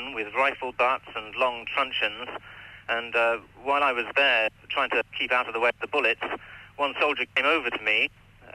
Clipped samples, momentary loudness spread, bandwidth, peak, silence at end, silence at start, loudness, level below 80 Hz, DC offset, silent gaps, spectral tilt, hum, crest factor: under 0.1%; 11 LU; 15 kHz; -10 dBFS; 0.1 s; 0 s; -25 LUFS; -62 dBFS; under 0.1%; none; -3.5 dB/octave; none; 16 dB